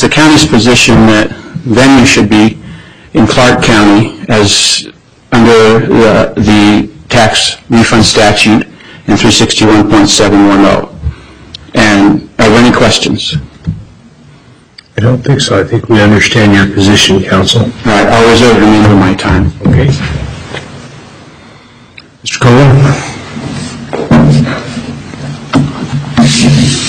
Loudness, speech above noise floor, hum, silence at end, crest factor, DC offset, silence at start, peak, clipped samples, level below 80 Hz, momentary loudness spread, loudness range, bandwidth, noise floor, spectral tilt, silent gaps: -6 LUFS; 32 dB; none; 0 s; 8 dB; under 0.1%; 0 s; 0 dBFS; 0.5%; -26 dBFS; 16 LU; 5 LU; 15 kHz; -38 dBFS; -5 dB/octave; none